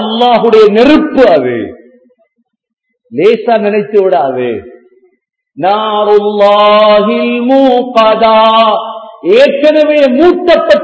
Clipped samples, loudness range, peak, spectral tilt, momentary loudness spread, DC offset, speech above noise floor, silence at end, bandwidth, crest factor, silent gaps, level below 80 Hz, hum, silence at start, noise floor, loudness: 3%; 6 LU; 0 dBFS; -6 dB/octave; 10 LU; under 0.1%; 56 dB; 0 s; 8 kHz; 8 dB; 2.73-2.77 s; -46 dBFS; none; 0 s; -62 dBFS; -7 LUFS